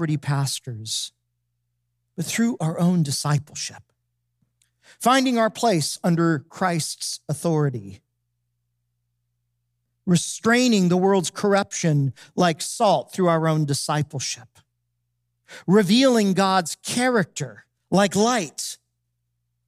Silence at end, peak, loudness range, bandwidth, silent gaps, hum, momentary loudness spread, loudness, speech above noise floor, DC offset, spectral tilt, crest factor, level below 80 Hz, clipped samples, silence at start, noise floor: 0.95 s; -6 dBFS; 5 LU; 15.5 kHz; none; 60 Hz at -50 dBFS; 12 LU; -22 LUFS; 54 dB; under 0.1%; -5 dB/octave; 18 dB; -70 dBFS; under 0.1%; 0 s; -76 dBFS